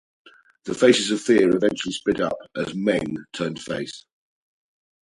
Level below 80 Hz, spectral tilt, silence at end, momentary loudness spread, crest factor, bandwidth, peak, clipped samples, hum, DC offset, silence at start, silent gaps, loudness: -58 dBFS; -4.5 dB/octave; 1.05 s; 14 LU; 22 dB; 11.5 kHz; -2 dBFS; under 0.1%; none; under 0.1%; 0.65 s; none; -22 LUFS